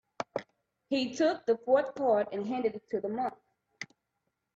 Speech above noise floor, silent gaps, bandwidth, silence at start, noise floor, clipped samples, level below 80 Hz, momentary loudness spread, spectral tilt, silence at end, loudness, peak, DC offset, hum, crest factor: 53 dB; none; 8 kHz; 0.2 s; -83 dBFS; under 0.1%; -76 dBFS; 17 LU; -5 dB/octave; 0.7 s; -31 LUFS; -14 dBFS; under 0.1%; none; 18 dB